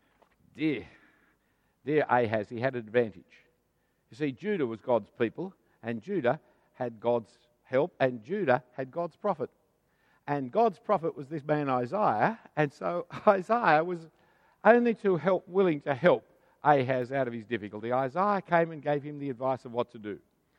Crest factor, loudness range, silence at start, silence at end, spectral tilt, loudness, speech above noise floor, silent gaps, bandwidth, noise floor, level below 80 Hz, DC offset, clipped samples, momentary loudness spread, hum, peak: 24 dB; 6 LU; 0.55 s; 0.4 s; -8 dB/octave; -29 LUFS; 45 dB; none; 9.4 kHz; -74 dBFS; -74 dBFS; under 0.1%; under 0.1%; 12 LU; none; -6 dBFS